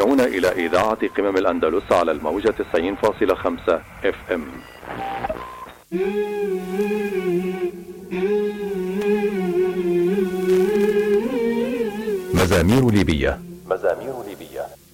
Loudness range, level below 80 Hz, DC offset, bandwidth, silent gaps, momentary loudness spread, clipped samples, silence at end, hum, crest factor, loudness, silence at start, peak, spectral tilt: 6 LU; -42 dBFS; under 0.1%; 17 kHz; none; 13 LU; under 0.1%; 0.2 s; none; 16 dB; -21 LUFS; 0 s; -6 dBFS; -6.5 dB/octave